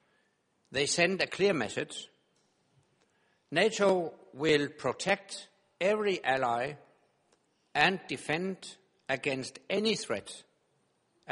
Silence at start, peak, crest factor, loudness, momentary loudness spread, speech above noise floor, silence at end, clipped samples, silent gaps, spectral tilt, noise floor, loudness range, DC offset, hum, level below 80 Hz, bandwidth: 0.7 s; -8 dBFS; 24 dB; -31 LUFS; 17 LU; 43 dB; 0 s; under 0.1%; none; -3.5 dB/octave; -74 dBFS; 3 LU; under 0.1%; none; -70 dBFS; 11.5 kHz